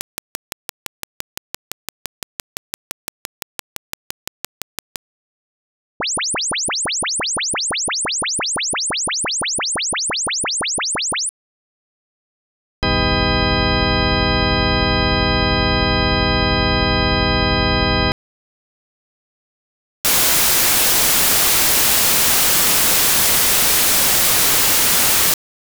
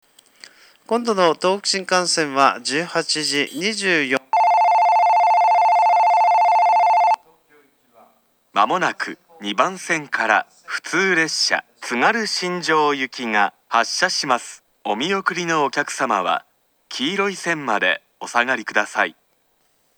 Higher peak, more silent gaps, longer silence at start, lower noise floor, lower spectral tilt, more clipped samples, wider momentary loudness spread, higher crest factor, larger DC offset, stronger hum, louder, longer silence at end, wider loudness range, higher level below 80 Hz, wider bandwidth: about the same, 0 dBFS vs 0 dBFS; first, 11.29-12.82 s, 18.12-20.04 s vs none; first, 6 s vs 0.9 s; first, under -90 dBFS vs -64 dBFS; about the same, -2 dB/octave vs -2.5 dB/octave; neither; first, 24 LU vs 9 LU; about the same, 18 dB vs 20 dB; neither; neither; first, -14 LUFS vs -19 LUFS; second, 0.45 s vs 0.85 s; first, 23 LU vs 6 LU; first, -32 dBFS vs -82 dBFS; about the same, over 20 kHz vs over 20 kHz